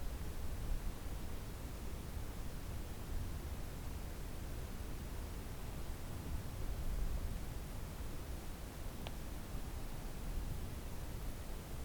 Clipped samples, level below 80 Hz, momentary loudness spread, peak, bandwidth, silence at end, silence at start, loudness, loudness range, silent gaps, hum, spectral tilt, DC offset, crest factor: under 0.1%; -44 dBFS; 3 LU; -26 dBFS; over 20 kHz; 0 s; 0 s; -47 LUFS; 1 LU; none; none; -5.5 dB/octave; under 0.1%; 18 dB